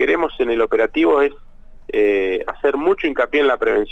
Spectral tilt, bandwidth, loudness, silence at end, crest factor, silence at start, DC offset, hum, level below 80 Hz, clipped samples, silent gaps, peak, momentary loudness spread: -5.5 dB/octave; 7.2 kHz; -18 LUFS; 0 s; 12 dB; 0 s; under 0.1%; none; -42 dBFS; under 0.1%; none; -6 dBFS; 5 LU